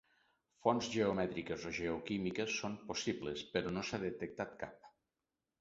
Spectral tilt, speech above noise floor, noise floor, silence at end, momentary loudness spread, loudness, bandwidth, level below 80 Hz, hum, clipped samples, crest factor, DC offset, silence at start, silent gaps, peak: -4 dB/octave; over 51 dB; under -90 dBFS; 0.7 s; 9 LU; -39 LUFS; 7.6 kHz; -66 dBFS; none; under 0.1%; 24 dB; under 0.1%; 0.65 s; none; -16 dBFS